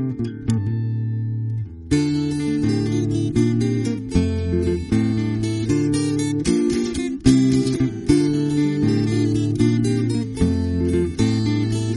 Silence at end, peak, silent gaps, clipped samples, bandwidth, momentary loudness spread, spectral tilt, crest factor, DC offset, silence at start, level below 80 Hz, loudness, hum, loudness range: 0 s; -2 dBFS; none; under 0.1%; 11.5 kHz; 5 LU; -7 dB/octave; 18 dB; under 0.1%; 0 s; -38 dBFS; -21 LUFS; none; 3 LU